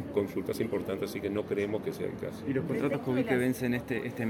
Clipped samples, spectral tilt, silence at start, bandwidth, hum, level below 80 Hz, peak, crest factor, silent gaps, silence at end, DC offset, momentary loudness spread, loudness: under 0.1%; -6.5 dB/octave; 0 s; 17 kHz; none; -60 dBFS; -12 dBFS; 18 dB; none; 0 s; under 0.1%; 7 LU; -32 LUFS